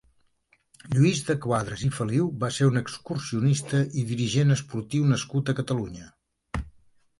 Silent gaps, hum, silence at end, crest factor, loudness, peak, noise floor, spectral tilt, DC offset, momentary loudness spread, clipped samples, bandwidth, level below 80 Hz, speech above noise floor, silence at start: none; none; 0.5 s; 16 dB; -26 LUFS; -10 dBFS; -67 dBFS; -6 dB/octave; under 0.1%; 14 LU; under 0.1%; 11.5 kHz; -50 dBFS; 42 dB; 0.85 s